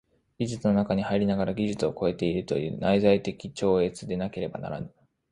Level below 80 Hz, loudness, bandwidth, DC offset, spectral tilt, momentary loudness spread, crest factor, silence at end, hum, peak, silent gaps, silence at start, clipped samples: -54 dBFS; -27 LUFS; 10.5 kHz; under 0.1%; -7 dB/octave; 11 LU; 18 dB; 0.45 s; none; -8 dBFS; none; 0.4 s; under 0.1%